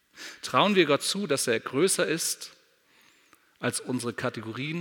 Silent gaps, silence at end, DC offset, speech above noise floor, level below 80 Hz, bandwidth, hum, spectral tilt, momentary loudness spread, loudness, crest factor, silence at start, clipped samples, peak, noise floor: none; 0 s; under 0.1%; 35 dB; -76 dBFS; 19 kHz; none; -3.5 dB/octave; 12 LU; -26 LUFS; 22 dB; 0.15 s; under 0.1%; -6 dBFS; -62 dBFS